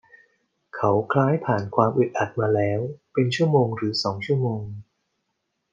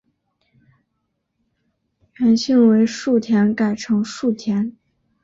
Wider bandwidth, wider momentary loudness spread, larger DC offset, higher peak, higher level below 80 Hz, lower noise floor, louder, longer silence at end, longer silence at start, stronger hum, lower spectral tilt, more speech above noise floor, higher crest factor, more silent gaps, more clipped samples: first, 9.2 kHz vs 7.8 kHz; about the same, 8 LU vs 8 LU; neither; about the same, -4 dBFS vs -4 dBFS; second, -66 dBFS vs -60 dBFS; first, -77 dBFS vs -73 dBFS; second, -23 LUFS vs -18 LUFS; first, 0.9 s vs 0.55 s; second, 0.75 s vs 2.2 s; neither; about the same, -7 dB/octave vs -6 dB/octave; about the same, 55 dB vs 56 dB; about the same, 20 dB vs 16 dB; neither; neither